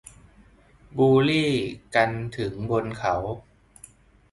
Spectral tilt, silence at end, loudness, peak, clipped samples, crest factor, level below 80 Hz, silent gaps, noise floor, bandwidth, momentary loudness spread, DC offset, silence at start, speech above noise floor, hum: -6.5 dB/octave; 0.9 s; -24 LUFS; -6 dBFS; under 0.1%; 18 dB; -52 dBFS; none; -55 dBFS; 11.5 kHz; 13 LU; under 0.1%; 0.95 s; 31 dB; none